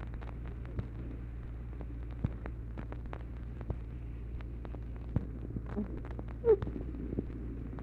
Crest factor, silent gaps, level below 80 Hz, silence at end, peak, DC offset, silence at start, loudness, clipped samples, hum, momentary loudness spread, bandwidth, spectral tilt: 22 dB; none; -42 dBFS; 0 s; -16 dBFS; under 0.1%; 0 s; -39 LUFS; under 0.1%; none; 11 LU; 4.3 kHz; -10.5 dB/octave